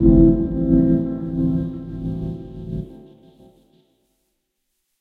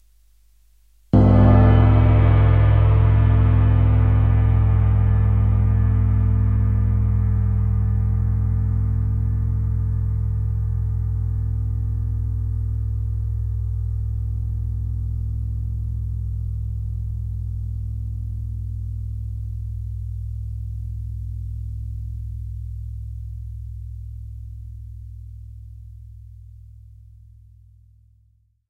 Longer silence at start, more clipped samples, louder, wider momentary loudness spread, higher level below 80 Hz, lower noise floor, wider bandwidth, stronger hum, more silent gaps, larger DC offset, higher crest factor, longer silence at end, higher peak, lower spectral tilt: second, 0 s vs 1.15 s; neither; about the same, -20 LUFS vs -21 LUFS; about the same, 16 LU vs 18 LU; second, -30 dBFS vs -24 dBFS; first, -74 dBFS vs -60 dBFS; about the same, 3.8 kHz vs 3.5 kHz; second, none vs 50 Hz at -55 dBFS; neither; second, under 0.1% vs 0.1%; about the same, 20 dB vs 18 dB; first, 2.05 s vs 1.75 s; about the same, 0 dBFS vs -2 dBFS; first, -12.5 dB/octave vs -11 dB/octave